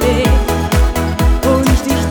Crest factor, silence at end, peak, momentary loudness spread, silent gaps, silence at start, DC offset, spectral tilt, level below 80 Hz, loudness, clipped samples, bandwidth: 12 dB; 0 s; -2 dBFS; 3 LU; none; 0 s; under 0.1%; -5.5 dB/octave; -16 dBFS; -14 LUFS; under 0.1%; over 20 kHz